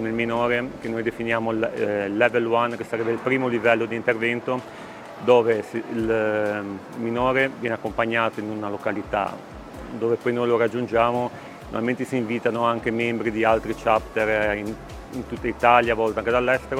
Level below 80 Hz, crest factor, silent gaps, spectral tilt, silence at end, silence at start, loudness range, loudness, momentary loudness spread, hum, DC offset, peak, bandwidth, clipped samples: -48 dBFS; 22 dB; none; -6 dB/octave; 0 s; 0 s; 3 LU; -23 LUFS; 11 LU; none; under 0.1%; -2 dBFS; 15.5 kHz; under 0.1%